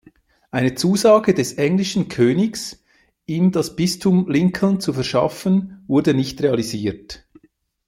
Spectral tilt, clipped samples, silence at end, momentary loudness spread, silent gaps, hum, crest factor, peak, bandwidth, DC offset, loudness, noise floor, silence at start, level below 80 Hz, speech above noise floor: -6 dB/octave; under 0.1%; 0.7 s; 12 LU; none; none; 16 dB; -2 dBFS; 16 kHz; under 0.1%; -19 LUFS; -59 dBFS; 0.55 s; -52 dBFS; 41 dB